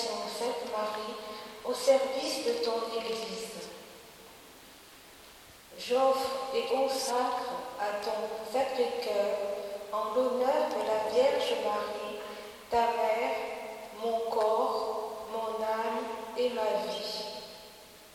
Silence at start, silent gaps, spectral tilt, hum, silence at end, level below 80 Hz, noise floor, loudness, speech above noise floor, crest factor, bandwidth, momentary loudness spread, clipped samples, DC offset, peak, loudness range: 0 s; none; -2.5 dB/octave; none; 0 s; -68 dBFS; -53 dBFS; -31 LUFS; 23 dB; 18 dB; 17 kHz; 22 LU; under 0.1%; under 0.1%; -14 dBFS; 5 LU